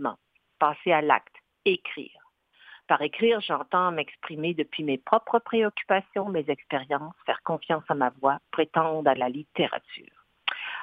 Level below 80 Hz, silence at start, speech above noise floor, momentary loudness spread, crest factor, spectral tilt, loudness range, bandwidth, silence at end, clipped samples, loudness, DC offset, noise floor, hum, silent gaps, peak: -76 dBFS; 0 s; 32 dB; 8 LU; 24 dB; -8 dB/octave; 2 LU; 4.9 kHz; 0 s; under 0.1%; -27 LUFS; under 0.1%; -59 dBFS; none; none; -4 dBFS